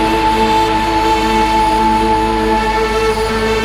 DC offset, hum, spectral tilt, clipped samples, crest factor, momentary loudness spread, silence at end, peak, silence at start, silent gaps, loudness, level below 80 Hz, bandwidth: under 0.1%; none; -4.5 dB/octave; under 0.1%; 10 dB; 2 LU; 0 s; -2 dBFS; 0 s; none; -13 LUFS; -26 dBFS; 16 kHz